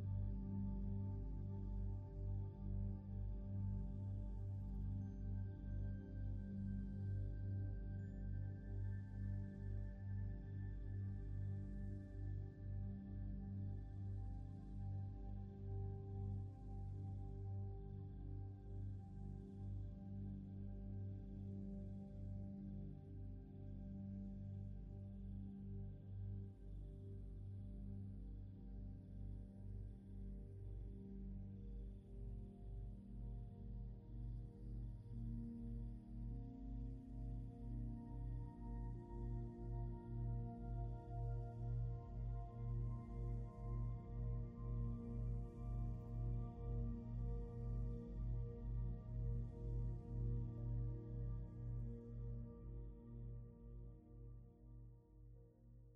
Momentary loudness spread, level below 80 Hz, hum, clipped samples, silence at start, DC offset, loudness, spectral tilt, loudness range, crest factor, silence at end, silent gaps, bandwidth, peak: 8 LU; -52 dBFS; none; under 0.1%; 0 s; under 0.1%; -50 LUFS; -11.5 dB/octave; 7 LU; 14 dB; 0 s; none; 2.2 kHz; -34 dBFS